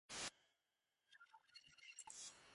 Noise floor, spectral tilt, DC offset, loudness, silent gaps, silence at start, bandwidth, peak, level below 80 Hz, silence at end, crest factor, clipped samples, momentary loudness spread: under -90 dBFS; 0 dB/octave; under 0.1%; -55 LUFS; none; 0.1 s; 11.5 kHz; -34 dBFS; -86 dBFS; 0 s; 24 dB; under 0.1%; 18 LU